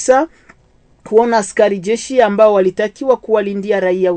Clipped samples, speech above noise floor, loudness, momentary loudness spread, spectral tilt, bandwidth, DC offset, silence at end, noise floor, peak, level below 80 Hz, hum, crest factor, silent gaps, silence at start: under 0.1%; 38 dB; -14 LUFS; 7 LU; -5 dB/octave; 9.2 kHz; under 0.1%; 0 s; -51 dBFS; 0 dBFS; -54 dBFS; none; 14 dB; none; 0 s